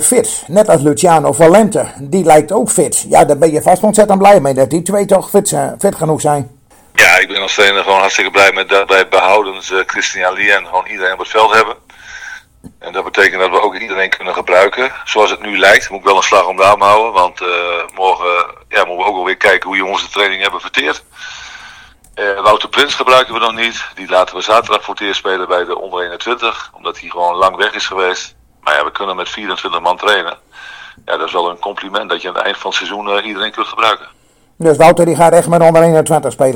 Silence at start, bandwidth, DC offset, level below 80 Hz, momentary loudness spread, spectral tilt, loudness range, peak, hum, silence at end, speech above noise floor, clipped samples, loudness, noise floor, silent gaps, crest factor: 0 s; over 20 kHz; under 0.1%; -48 dBFS; 12 LU; -3 dB/octave; 7 LU; 0 dBFS; none; 0 s; 27 dB; 1%; -11 LUFS; -39 dBFS; none; 12 dB